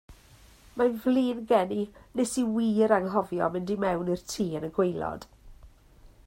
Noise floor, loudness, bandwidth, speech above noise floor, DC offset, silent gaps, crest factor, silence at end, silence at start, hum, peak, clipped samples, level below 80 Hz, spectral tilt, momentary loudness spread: -55 dBFS; -28 LUFS; 16 kHz; 28 dB; under 0.1%; none; 20 dB; 0.2 s; 0.1 s; none; -10 dBFS; under 0.1%; -56 dBFS; -6 dB/octave; 10 LU